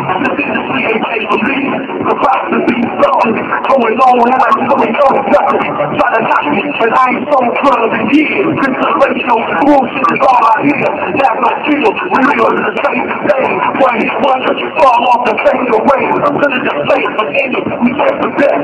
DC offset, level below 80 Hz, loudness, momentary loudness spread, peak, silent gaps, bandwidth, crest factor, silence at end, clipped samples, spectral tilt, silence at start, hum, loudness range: under 0.1%; -50 dBFS; -11 LUFS; 5 LU; 0 dBFS; none; 9.8 kHz; 10 dB; 0 s; under 0.1%; -6.5 dB/octave; 0 s; none; 2 LU